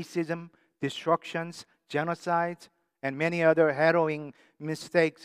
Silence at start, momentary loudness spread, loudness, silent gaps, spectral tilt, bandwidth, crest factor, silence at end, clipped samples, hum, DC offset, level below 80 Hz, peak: 0 s; 15 LU; -28 LUFS; none; -6 dB/octave; 15 kHz; 20 dB; 0 s; under 0.1%; none; under 0.1%; -82 dBFS; -8 dBFS